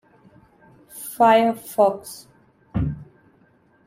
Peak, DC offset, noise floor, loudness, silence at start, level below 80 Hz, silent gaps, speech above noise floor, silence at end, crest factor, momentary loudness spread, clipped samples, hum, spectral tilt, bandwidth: -4 dBFS; under 0.1%; -58 dBFS; -20 LUFS; 0.95 s; -46 dBFS; none; 40 dB; 0.85 s; 20 dB; 23 LU; under 0.1%; none; -5.5 dB/octave; 16 kHz